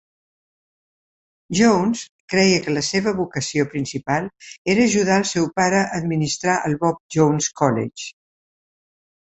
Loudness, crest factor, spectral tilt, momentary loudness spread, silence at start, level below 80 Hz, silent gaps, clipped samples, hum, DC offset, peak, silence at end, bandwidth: -20 LUFS; 20 dB; -4.5 dB/octave; 9 LU; 1.5 s; -54 dBFS; 2.09-2.28 s, 4.58-4.65 s, 7.00-7.09 s; under 0.1%; none; under 0.1%; -2 dBFS; 1.25 s; 8.4 kHz